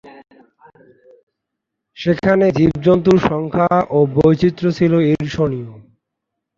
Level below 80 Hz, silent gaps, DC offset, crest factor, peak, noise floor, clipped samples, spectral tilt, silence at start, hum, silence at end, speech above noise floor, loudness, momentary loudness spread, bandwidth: -44 dBFS; 1.23-1.27 s; under 0.1%; 16 dB; -2 dBFS; -79 dBFS; under 0.1%; -8.5 dB/octave; 0.05 s; none; 0.8 s; 64 dB; -15 LUFS; 7 LU; 7.4 kHz